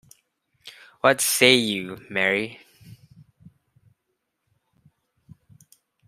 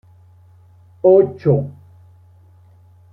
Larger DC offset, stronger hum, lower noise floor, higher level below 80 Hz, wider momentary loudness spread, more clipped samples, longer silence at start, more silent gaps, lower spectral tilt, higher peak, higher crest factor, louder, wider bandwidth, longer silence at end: neither; neither; first, -78 dBFS vs -48 dBFS; second, -68 dBFS vs -56 dBFS; first, 20 LU vs 9 LU; neither; second, 0.65 s vs 1.05 s; neither; second, -2.5 dB/octave vs -12 dB/octave; about the same, -2 dBFS vs -2 dBFS; first, 26 dB vs 18 dB; second, -20 LUFS vs -15 LUFS; first, 15.5 kHz vs 2.7 kHz; first, 3.15 s vs 1.45 s